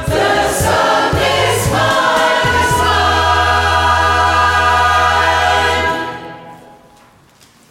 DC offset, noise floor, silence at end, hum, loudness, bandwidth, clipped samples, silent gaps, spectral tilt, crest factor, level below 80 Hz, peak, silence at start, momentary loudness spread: under 0.1%; -47 dBFS; 1.15 s; none; -12 LUFS; 16.5 kHz; under 0.1%; none; -3.5 dB/octave; 12 dB; -30 dBFS; -2 dBFS; 0 s; 3 LU